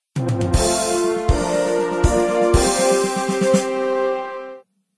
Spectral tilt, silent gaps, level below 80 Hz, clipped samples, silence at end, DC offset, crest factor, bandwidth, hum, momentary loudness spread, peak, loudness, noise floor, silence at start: -5 dB/octave; none; -28 dBFS; under 0.1%; 0.4 s; 0.2%; 18 dB; 11 kHz; none; 7 LU; -2 dBFS; -19 LUFS; -40 dBFS; 0.15 s